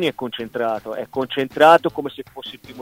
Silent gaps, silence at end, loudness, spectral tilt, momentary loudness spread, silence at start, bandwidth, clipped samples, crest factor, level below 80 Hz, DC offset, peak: none; 0 s; -19 LUFS; -5 dB/octave; 21 LU; 0 s; 16 kHz; under 0.1%; 20 dB; -58 dBFS; under 0.1%; 0 dBFS